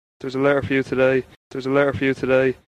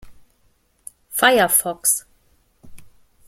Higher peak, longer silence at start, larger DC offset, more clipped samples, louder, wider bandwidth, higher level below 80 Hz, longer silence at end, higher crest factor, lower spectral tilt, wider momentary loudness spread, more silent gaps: about the same, -4 dBFS vs -2 dBFS; first, 0.25 s vs 0.05 s; neither; neither; second, -20 LUFS vs -17 LUFS; second, 9.8 kHz vs 16.5 kHz; about the same, -52 dBFS vs -54 dBFS; second, 0.2 s vs 0.4 s; second, 16 dB vs 22 dB; first, -7 dB/octave vs -1 dB/octave; about the same, 9 LU vs 8 LU; first, 1.37-1.51 s vs none